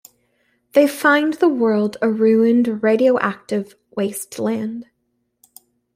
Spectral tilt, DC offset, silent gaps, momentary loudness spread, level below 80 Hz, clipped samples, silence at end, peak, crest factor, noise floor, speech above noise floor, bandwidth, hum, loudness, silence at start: -5.5 dB/octave; under 0.1%; none; 11 LU; -66 dBFS; under 0.1%; 1.15 s; -2 dBFS; 16 dB; -70 dBFS; 53 dB; 16 kHz; 60 Hz at -40 dBFS; -18 LUFS; 0.75 s